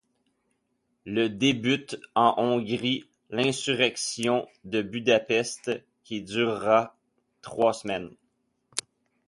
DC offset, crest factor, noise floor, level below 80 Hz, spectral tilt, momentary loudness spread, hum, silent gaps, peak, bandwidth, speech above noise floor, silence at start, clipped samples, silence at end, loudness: under 0.1%; 24 dB; -75 dBFS; -66 dBFS; -4 dB/octave; 12 LU; none; none; -4 dBFS; 11.5 kHz; 49 dB; 1.05 s; under 0.1%; 0.45 s; -26 LUFS